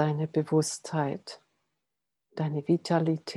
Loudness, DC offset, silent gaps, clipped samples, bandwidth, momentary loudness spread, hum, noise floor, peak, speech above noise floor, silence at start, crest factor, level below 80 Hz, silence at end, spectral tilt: -29 LUFS; under 0.1%; none; under 0.1%; 12.5 kHz; 16 LU; none; -86 dBFS; -12 dBFS; 58 dB; 0 s; 18 dB; -78 dBFS; 0 s; -6 dB/octave